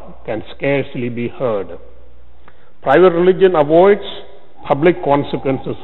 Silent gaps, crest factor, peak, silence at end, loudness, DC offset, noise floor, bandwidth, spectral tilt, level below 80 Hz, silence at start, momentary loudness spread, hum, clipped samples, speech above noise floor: none; 16 dB; 0 dBFS; 0 s; -15 LUFS; 4%; -47 dBFS; 4.2 kHz; -9.5 dB/octave; -46 dBFS; 0.05 s; 15 LU; none; under 0.1%; 33 dB